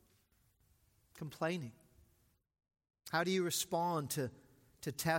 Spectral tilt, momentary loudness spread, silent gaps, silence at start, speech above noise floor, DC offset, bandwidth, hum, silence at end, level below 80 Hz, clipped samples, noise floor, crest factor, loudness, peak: -4 dB/octave; 16 LU; none; 1.15 s; 37 dB; under 0.1%; 16.5 kHz; none; 0 s; -74 dBFS; under 0.1%; -74 dBFS; 20 dB; -38 LUFS; -20 dBFS